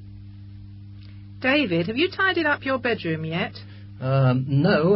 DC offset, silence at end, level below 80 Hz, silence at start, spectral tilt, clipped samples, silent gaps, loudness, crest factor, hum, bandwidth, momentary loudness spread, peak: under 0.1%; 0 s; -52 dBFS; 0 s; -11 dB/octave; under 0.1%; none; -23 LUFS; 14 dB; none; 5.8 kHz; 22 LU; -8 dBFS